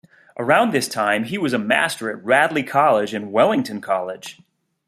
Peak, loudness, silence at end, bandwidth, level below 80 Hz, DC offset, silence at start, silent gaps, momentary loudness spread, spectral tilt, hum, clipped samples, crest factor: 0 dBFS; -19 LUFS; 0.55 s; 15 kHz; -66 dBFS; under 0.1%; 0.35 s; none; 11 LU; -4.5 dB/octave; none; under 0.1%; 20 dB